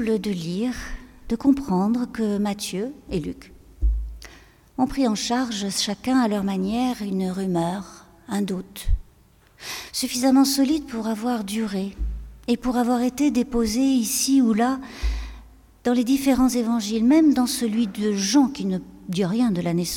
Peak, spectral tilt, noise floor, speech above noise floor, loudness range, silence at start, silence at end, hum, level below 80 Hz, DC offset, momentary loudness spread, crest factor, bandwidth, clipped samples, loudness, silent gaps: -6 dBFS; -5 dB/octave; -55 dBFS; 33 dB; 6 LU; 0 s; 0 s; none; -36 dBFS; under 0.1%; 13 LU; 16 dB; 18 kHz; under 0.1%; -23 LUFS; none